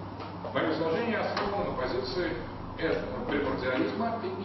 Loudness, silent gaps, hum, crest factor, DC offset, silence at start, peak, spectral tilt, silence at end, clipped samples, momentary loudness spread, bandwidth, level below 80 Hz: -31 LUFS; none; none; 18 dB; under 0.1%; 0 s; -14 dBFS; -4 dB/octave; 0 s; under 0.1%; 5 LU; 6.2 kHz; -50 dBFS